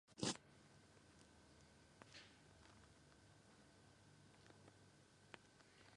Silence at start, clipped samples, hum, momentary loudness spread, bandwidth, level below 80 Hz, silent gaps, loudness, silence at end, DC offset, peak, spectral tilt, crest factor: 0.05 s; under 0.1%; none; 16 LU; 11 kHz; -80 dBFS; none; -58 LUFS; 0 s; under 0.1%; -30 dBFS; -3 dB/octave; 30 dB